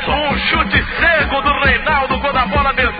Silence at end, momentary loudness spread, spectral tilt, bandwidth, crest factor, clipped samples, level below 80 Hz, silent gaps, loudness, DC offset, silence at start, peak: 0 s; 3 LU; -10.5 dB/octave; 5 kHz; 14 dB; under 0.1%; -26 dBFS; none; -14 LUFS; under 0.1%; 0 s; 0 dBFS